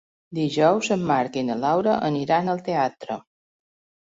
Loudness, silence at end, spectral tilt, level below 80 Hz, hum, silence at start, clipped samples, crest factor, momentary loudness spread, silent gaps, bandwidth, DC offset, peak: -22 LUFS; 0.95 s; -6 dB/octave; -64 dBFS; none; 0.3 s; under 0.1%; 18 dB; 13 LU; none; 8 kHz; under 0.1%; -6 dBFS